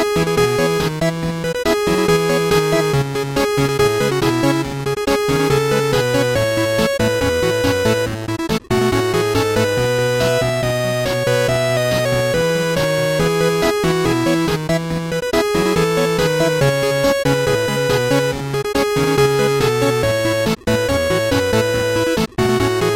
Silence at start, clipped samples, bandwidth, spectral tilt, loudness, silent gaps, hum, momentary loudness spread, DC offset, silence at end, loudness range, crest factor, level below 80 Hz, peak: 0 s; under 0.1%; 17 kHz; -5 dB/octave; -17 LUFS; none; none; 4 LU; under 0.1%; 0 s; 1 LU; 12 dB; -38 dBFS; -4 dBFS